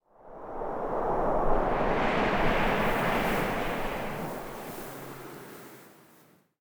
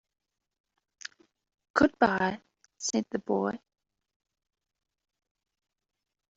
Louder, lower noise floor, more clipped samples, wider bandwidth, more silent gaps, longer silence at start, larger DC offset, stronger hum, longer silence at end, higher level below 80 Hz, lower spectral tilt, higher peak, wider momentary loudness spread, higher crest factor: about the same, -29 LUFS vs -29 LUFS; first, -60 dBFS vs -49 dBFS; neither; first, over 20 kHz vs 8 kHz; neither; second, 0.2 s vs 1.75 s; neither; neither; second, 0.45 s vs 2.8 s; first, -38 dBFS vs -64 dBFS; first, -5.5 dB/octave vs -4 dB/octave; second, -12 dBFS vs -8 dBFS; second, 18 LU vs 21 LU; second, 18 dB vs 26 dB